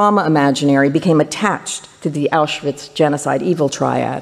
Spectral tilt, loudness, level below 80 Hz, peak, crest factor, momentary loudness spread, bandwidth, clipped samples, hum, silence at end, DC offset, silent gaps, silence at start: -5.5 dB/octave; -16 LUFS; -58 dBFS; -2 dBFS; 14 dB; 9 LU; 13 kHz; under 0.1%; none; 0 s; under 0.1%; none; 0 s